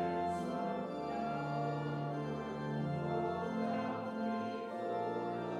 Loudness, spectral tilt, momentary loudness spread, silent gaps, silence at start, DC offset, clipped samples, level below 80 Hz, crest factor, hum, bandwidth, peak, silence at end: -38 LUFS; -8 dB/octave; 3 LU; none; 0 s; under 0.1%; under 0.1%; -70 dBFS; 12 dB; none; 11.5 kHz; -24 dBFS; 0 s